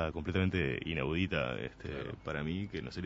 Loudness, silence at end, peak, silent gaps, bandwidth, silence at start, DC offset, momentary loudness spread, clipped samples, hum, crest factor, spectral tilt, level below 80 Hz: -36 LUFS; 0 s; -16 dBFS; none; 7.6 kHz; 0 s; under 0.1%; 9 LU; under 0.1%; none; 18 dB; -5 dB/octave; -50 dBFS